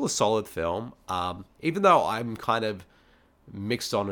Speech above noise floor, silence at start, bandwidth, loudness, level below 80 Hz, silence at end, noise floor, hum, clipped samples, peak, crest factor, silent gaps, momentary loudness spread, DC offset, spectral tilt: 34 dB; 0 s; 19 kHz; -27 LUFS; -58 dBFS; 0 s; -60 dBFS; none; under 0.1%; -6 dBFS; 20 dB; none; 14 LU; under 0.1%; -4.5 dB/octave